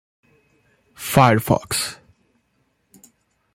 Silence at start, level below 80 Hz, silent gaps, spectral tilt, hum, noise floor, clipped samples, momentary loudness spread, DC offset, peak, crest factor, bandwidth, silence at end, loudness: 1 s; -52 dBFS; none; -5 dB/octave; none; -67 dBFS; under 0.1%; 13 LU; under 0.1%; -2 dBFS; 22 dB; 16.5 kHz; 1.6 s; -19 LUFS